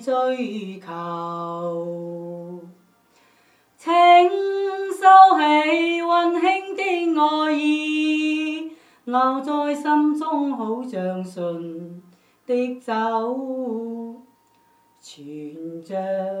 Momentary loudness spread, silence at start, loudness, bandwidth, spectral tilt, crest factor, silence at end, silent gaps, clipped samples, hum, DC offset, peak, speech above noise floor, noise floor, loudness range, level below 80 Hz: 21 LU; 0 s; -20 LUFS; 11.5 kHz; -5 dB/octave; 20 dB; 0 s; none; under 0.1%; none; under 0.1%; 0 dBFS; 39 dB; -59 dBFS; 13 LU; -84 dBFS